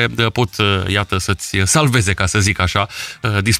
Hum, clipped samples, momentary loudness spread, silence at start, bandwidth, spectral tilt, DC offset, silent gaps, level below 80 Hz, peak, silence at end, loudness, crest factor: none; under 0.1%; 6 LU; 0 s; 16 kHz; -4 dB/octave; under 0.1%; none; -36 dBFS; -2 dBFS; 0 s; -16 LUFS; 14 dB